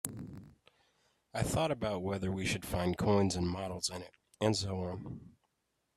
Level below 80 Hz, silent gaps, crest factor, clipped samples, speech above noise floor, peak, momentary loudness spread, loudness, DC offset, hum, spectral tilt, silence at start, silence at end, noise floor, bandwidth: -56 dBFS; none; 22 dB; under 0.1%; 48 dB; -14 dBFS; 17 LU; -35 LUFS; under 0.1%; none; -5 dB/octave; 0.05 s; 0.65 s; -82 dBFS; 15.5 kHz